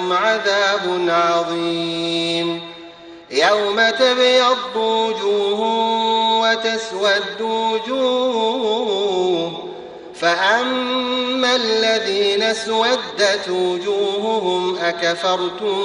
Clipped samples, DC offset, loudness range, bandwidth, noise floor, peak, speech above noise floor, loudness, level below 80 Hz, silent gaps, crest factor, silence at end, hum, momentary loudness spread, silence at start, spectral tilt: under 0.1%; under 0.1%; 3 LU; 11 kHz; -39 dBFS; -2 dBFS; 21 dB; -18 LUFS; -62 dBFS; none; 16 dB; 0 s; none; 6 LU; 0 s; -3 dB/octave